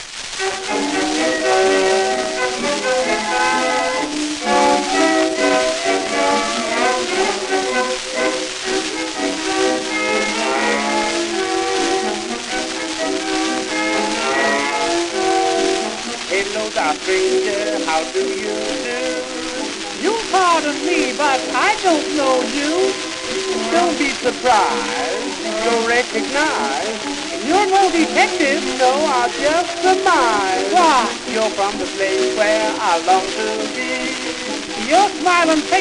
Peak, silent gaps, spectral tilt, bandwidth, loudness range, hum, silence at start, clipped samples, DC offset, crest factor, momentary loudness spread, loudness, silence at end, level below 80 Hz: 0 dBFS; none; -2 dB/octave; 12 kHz; 3 LU; none; 0 s; under 0.1%; under 0.1%; 18 dB; 7 LU; -17 LUFS; 0 s; -50 dBFS